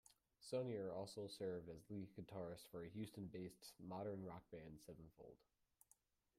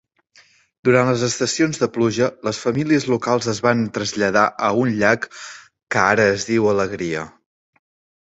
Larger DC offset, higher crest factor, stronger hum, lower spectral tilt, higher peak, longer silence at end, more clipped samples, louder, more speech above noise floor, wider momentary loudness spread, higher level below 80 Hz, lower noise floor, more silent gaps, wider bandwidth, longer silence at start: neither; about the same, 18 dB vs 20 dB; neither; about the same, -6 dB/octave vs -5 dB/octave; second, -34 dBFS vs 0 dBFS; about the same, 1 s vs 1 s; neither; second, -53 LUFS vs -19 LUFS; second, 28 dB vs 36 dB; first, 14 LU vs 8 LU; second, -80 dBFS vs -54 dBFS; first, -80 dBFS vs -54 dBFS; neither; first, 15.5 kHz vs 8.2 kHz; second, 0.1 s vs 0.85 s